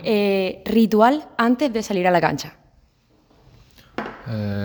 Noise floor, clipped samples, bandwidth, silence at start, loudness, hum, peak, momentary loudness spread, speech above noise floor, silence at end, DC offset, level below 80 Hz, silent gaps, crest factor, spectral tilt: -59 dBFS; under 0.1%; over 20 kHz; 0 s; -20 LUFS; none; -2 dBFS; 16 LU; 39 dB; 0 s; under 0.1%; -54 dBFS; none; 20 dB; -6 dB/octave